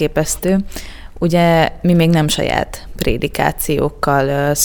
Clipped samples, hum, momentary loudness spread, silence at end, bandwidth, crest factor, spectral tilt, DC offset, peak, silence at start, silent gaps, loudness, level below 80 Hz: under 0.1%; none; 9 LU; 0 s; over 20 kHz; 16 dB; -5 dB/octave; under 0.1%; 0 dBFS; 0 s; none; -16 LUFS; -30 dBFS